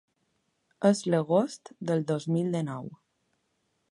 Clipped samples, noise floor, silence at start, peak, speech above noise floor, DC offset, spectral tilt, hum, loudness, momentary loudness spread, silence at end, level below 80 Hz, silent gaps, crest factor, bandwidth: under 0.1%; -76 dBFS; 0.8 s; -8 dBFS; 48 dB; under 0.1%; -6.5 dB/octave; none; -28 LUFS; 12 LU; 0.95 s; -76 dBFS; none; 22 dB; 11.5 kHz